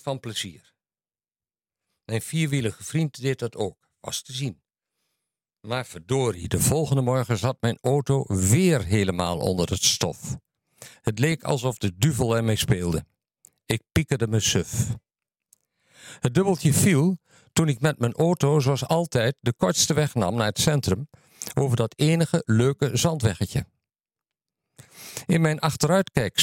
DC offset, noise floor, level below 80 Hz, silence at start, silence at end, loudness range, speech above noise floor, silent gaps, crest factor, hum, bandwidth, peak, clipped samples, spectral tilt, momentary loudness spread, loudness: under 0.1%; under -90 dBFS; -52 dBFS; 0.05 s; 0 s; 7 LU; over 67 dB; none; 20 dB; none; 17 kHz; -4 dBFS; under 0.1%; -5 dB/octave; 11 LU; -24 LUFS